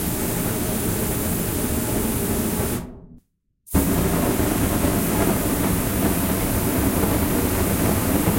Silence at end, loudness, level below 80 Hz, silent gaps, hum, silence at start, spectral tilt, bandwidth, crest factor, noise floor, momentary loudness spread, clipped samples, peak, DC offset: 0 s; -21 LUFS; -32 dBFS; none; none; 0 s; -5 dB/octave; 16.5 kHz; 16 dB; -59 dBFS; 3 LU; under 0.1%; -6 dBFS; under 0.1%